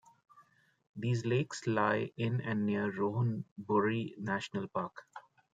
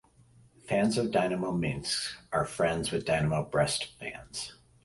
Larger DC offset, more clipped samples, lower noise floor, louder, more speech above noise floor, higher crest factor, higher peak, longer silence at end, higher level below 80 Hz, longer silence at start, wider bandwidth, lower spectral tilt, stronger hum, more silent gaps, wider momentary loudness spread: neither; neither; first, -66 dBFS vs -60 dBFS; second, -34 LUFS vs -30 LUFS; about the same, 32 dB vs 30 dB; about the same, 20 dB vs 18 dB; about the same, -16 dBFS vs -14 dBFS; about the same, 0.35 s vs 0.3 s; second, -76 dBFS vs -54 dBFS; second, 0.35 s vs 0.65 s; second, 9.2 kHz vs 11.5 kHz; first, -7 dB/octave vs -4.5 dB/octave; neither; first, 0.89-0.94 s, 3.51-3.56 s vs none; about the same, 12 LU vs 11 LU